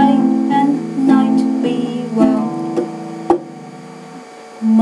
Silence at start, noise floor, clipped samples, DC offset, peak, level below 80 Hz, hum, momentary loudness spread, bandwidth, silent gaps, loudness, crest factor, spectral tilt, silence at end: 0 s; -35 dBFS; under 0.1%; under 0.1%; 0 dBFS; -58 dBFS; none; 21 LU; 11 kHz; none; -16 LUFS; 14 dB; -7 dB/octave; 0 s